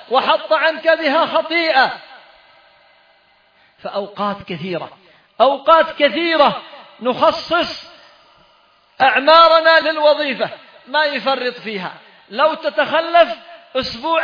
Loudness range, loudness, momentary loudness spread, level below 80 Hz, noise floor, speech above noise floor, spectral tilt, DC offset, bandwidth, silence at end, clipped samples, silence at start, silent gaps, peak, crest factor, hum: 8 LU; -15 LUFS; 15 LU; -58 dBFS; -54 dBFS; 39 dB; -5 dB/octave; under 0.1%; 5.2 kHz; 0 s; under 0.1%; 0.1 s; none; 0 dBFS; 18 dB; none